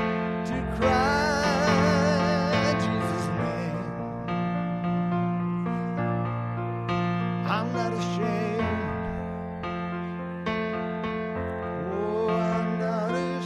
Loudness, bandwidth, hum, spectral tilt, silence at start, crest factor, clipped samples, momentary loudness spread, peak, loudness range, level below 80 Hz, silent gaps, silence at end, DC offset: -27 LUFS; 11 kHz; none; -6.5 dB/octave; 0 s; 16 dB; under 0.1%; 9 LU; -10 dBFS; 6 LU; -48 dBFS; none; 0 s; under 0.1%